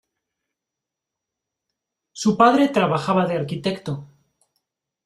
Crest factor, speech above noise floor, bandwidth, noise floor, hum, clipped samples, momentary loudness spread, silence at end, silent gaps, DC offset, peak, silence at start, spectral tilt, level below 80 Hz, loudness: 22 dB; 66 dB; 13 kHz; -85 dBFS; none; under 0.1%; 14 LU; 1 s; none; under 0.1%; -2 dBFS; 2.15 s; -6 dB/octave; -62 dBFS; -20 LUFS